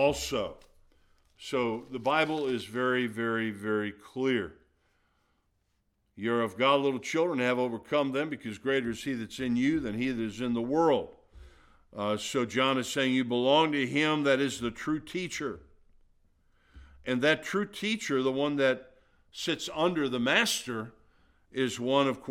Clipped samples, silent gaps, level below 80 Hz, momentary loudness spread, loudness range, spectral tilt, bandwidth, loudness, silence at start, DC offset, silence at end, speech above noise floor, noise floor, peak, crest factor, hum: under 0.1%; none; -60 dBFS; 10 LU; 5 LU; -4.5 dB/octave; 16 kHz; -29 LUFS; 0 s; under 0.1%; 0 s; 46 dB; -75 dBFS; -8 dBFS; 22 dB; none